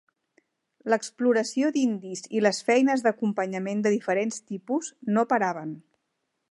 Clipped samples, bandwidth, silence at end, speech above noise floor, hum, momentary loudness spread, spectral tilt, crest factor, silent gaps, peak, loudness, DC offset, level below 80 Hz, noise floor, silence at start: under 0.1%; 11.5 kHz; 0.7 s; 53 dB; none; 11 LU; -5 dB/octave; 20 dB; none; -8 dBFS; -26 LUFS; under 0.1%; -80 dBFS; -79 dBFS; 0.85 s